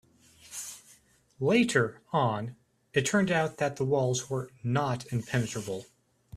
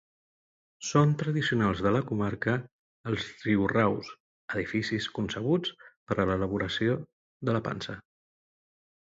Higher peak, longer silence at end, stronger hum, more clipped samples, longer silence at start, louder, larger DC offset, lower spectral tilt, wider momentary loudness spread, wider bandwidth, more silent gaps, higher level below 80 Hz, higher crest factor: about the same, -10 dBFS vs -10 dBFS; second, 0 s vs 1 s; neither; neither; second, 0.5 s vs 0.8 s; about the same, -29 LUFS vs -29 LUFS; neither; about the same, -5 dB/octave vs -6 dB/octave; about the same, 14 LU vs 12 LU; first, 14 kHz vs 7.8 kHz; second, none vs 2.71-3.04 s, 4.20-4.48 s, 5.97-6.07 s, 7.13-7.40 s; second, -64 dBFS vs -54 dBFS; about the same, 20 dB vs 20 dB